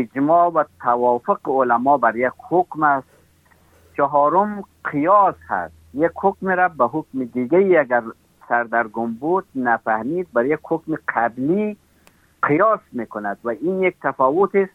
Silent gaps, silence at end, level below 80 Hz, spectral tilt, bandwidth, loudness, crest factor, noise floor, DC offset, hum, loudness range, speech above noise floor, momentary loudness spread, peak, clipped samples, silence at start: none; 0.05 s; -62 dBFS; -9 dB/octave; 4 kHz; -19 LUFS; 16 dB; -55 dBFS; under 0.1%; none; 3 LU; 36 dB; 10 LU; -4 dBFS; under 0.1%; 0 s